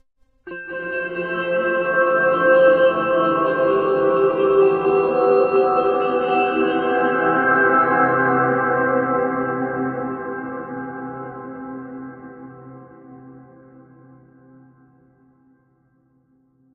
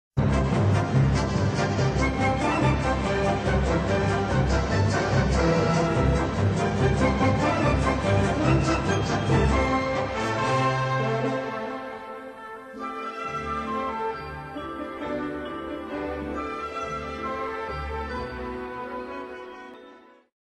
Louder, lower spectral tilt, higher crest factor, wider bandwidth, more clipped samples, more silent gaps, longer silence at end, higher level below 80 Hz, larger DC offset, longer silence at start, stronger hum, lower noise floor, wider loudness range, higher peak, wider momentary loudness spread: first, -18 LUFS vs -25 LUFS; first, -9 dB/octave vs -6.5 dB/octave; about the same, 16 dB vs 16 dB; second, 4.5 kHz vs 10 kHz; neither; neither; first, 3.35 s vs 0.5 s; second, -60 dBFS vs -36 dBFS; neither; first, 0.45 s vs 0.15 s; neither; first, -61 dBFS vs -50 dBFS; first, 17 LU vs 9 LU; first, -4 dBFS vs -8 dBFS; first, 18 LU vs 13 LU